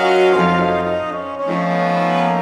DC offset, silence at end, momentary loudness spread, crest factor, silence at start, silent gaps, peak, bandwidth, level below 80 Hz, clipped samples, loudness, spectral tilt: under 0.1%; 0 s; 9 LU; 14 dB; 0 s; none; -2 dBFS; 10.5 kHz; -52 dBFS; under 0.1%; -17 LUFS; -6.5 dB/octave